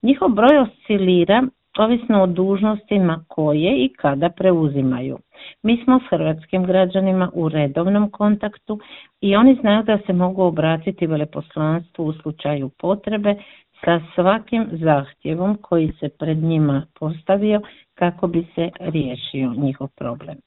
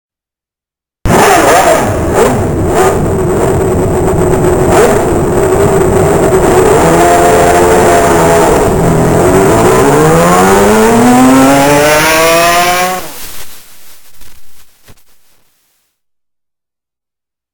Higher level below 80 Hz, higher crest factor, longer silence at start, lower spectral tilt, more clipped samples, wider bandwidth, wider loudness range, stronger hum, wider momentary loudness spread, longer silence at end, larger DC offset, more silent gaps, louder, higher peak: second, -52 dBFS vs -24 dBFS; first, 18 dB vs 8 dB; second, 0.05 s vs 1.05 s; first, -10.5 dB/octave vs -5 dB/octave; second, under 0.1% vs 1%; second, 4.1 kHz vs 20 kHz; about the same, 4 LU vs 4 LU; neither; first, 10 LU vs 6 LU; second, 0.1 s vs 2.6 s; neither; neither; second, -19 LUFS vs -7 LUFS; about the same, 0 dBFS vs 0 dBFS